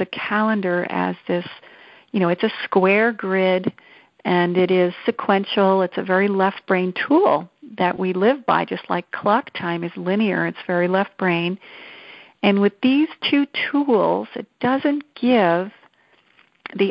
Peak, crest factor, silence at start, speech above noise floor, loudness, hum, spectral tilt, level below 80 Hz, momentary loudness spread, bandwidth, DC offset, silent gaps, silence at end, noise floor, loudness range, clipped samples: -2 dBFS; 18 dB; 0 s; 39 dB; -20 LUFS; none; -10 dB/octave; -66 dBFS; 9 LU; 5.6 kHz; under 0.1%; none; 0 s; -58 dBFS; 2 LU; under 0.1%